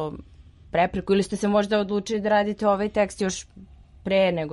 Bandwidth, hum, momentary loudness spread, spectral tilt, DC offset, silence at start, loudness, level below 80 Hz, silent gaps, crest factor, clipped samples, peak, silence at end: 11.5 kHz; none; 9 LU; -5 dB/octave; under 0.1%; 0 s; -24 LUFS; -50 dBFS; none; 16 dB; under 0.1%; -8 dBFS; 0 s